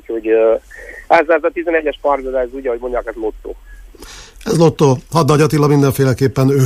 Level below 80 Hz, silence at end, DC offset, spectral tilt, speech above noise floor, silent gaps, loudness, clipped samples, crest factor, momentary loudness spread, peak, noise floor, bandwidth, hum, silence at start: -38 dBFS; 0 s; under 0.1%; -6.5 dB/octave; 22 dB; none; -15 LUFS; under 0.1%; 14 dB; 20 LU; 0 dBFS; -36 dBFS; 15.5 kHz; none; 0.1 s